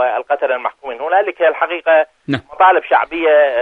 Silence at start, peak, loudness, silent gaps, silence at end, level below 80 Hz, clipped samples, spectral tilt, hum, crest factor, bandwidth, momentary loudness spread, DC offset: 0 s; 0 dBFS; -15 LUFS; none; 0 s; -58 dBFS; under 0.1%; -7 dB/octave; none; 14 dB; 4.6 kHz; 10 LU; under 0.1%